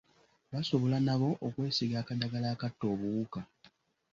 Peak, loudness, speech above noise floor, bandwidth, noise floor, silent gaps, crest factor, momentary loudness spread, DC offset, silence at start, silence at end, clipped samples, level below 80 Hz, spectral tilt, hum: -16 dBFS; -33 LUFS; 33 dB; 7.4 kHz; -65 dBFS; none; 18 dB; 11 LU; under 0.1%; 0.5 s; 0.7 s; under 0.1%; -66 dBFS; -7 dB/octave; none